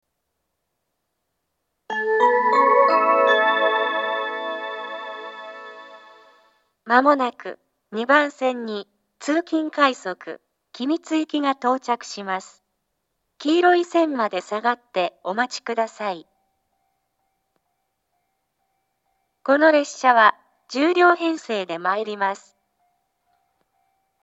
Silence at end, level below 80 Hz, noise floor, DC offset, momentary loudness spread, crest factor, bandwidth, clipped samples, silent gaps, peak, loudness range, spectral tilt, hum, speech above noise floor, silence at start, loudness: 1.85 s; -84 dBFS; -77 dBFS; under 0.1%; 17 LU; 22 dB; 8.2 kHz; under 0.1%; none; 0 dBFS; 8 LU; -3.5 dB/octave; none; 56 dB; 1.9 s; -20 LUFS